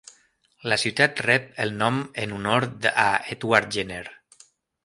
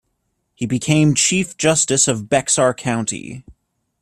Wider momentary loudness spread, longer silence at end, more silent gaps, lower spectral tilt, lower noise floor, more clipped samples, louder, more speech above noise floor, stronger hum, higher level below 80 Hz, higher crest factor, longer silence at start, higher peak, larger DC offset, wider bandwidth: second, 11 LU vs 14 LU; first, 0.7 s vs 0.5 s; neither; about the same, -4 dB/octave vs -3.5 dB/octave; second, -62 dBFS vs -70 dBFS; neither; second, -23 LUFS vs -16 LUFS; second, 38 dB vs 53 dB; neither; second, -60 dBFS vs -52 dBFS; first, 24 dB vs 16 dB; about the same, 0.65 s vs 0.6 s; about the same, -2 dBFS vs -2 dBFS; neither; second, 11.5 kHz vs 13.5 kHz